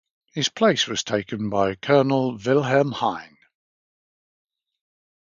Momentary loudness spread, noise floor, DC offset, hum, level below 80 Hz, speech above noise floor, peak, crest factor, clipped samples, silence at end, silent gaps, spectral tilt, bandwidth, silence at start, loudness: 7 LU; under -90 dBFS; under 0.1%; none; -60 dBFS; over 69 dB; -4 dBFS; 20 dB; under 0.1%; 2 s; none; -4.5 dB/octave; 7.6 kHz; 0.35 s; -22 LUFS